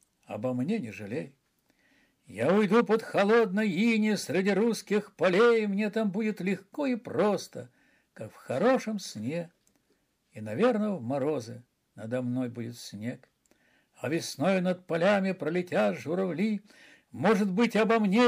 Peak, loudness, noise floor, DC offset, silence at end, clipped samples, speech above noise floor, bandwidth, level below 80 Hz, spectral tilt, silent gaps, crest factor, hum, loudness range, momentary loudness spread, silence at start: -10 dBFS; -28 LUFS; -73 dBFS; under 0.1%; 0 s; under 0.1%; 45 dB; 15.5 kHz; -78 dBFS; -6 dB/octave; none; 18 dB; none; 7 LU; 16 LU; 0.3 s